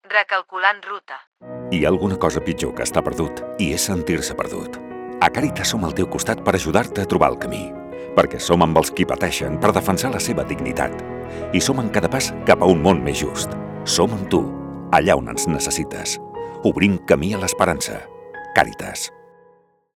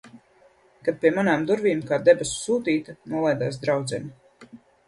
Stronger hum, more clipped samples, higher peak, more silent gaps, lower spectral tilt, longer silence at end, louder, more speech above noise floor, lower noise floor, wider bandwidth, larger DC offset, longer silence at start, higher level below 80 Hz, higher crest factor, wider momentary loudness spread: neither; neither; first, 0 dBFS vs -4 dBFS; first, 1.27-1.32 s vs none; about the same, -4.5 dB/octave vs -5 dB/octave; first, 0.85 s vs 0.3 s; first, -20 LUFS vs -23 LUFS; about the same, 36 dB vs 35 dB; about the same, -55 dBFS vs -58 dBFS; first, 18.5 kHz vs 11.5 kHz; neither; about the same, 0.1 s vs 0.05 s; first, -44 dBFS vs -60 dBFS; about the same, 20 dB vs 20 dB; first, 14 LU vs 11 LU